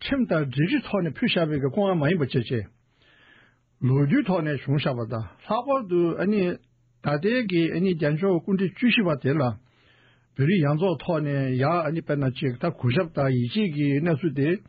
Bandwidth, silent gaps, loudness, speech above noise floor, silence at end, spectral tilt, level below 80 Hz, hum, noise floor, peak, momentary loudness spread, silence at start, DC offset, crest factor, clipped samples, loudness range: 5 kHz; none; -24 LUFS; 36 dB; 0.1 s; -6 dB/octave; -58 dBFS; none; -59 dBFS; -12 dBFS; 7 LU; 0 s; under 0.1%; 12 dB; under 0.1%; 2 LU